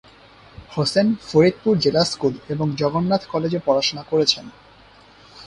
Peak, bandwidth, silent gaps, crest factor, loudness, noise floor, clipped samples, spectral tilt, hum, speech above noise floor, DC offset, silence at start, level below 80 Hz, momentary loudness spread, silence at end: -2 dBFS; 11.5 kHz; none; 18 dB; -20 LUFS; -49 dBFS; under 0.1%; -5.5 dB/octave; none; 29 dB; under 0.1%; 0.6 s; -54 dBFS; 7 LU; 0 s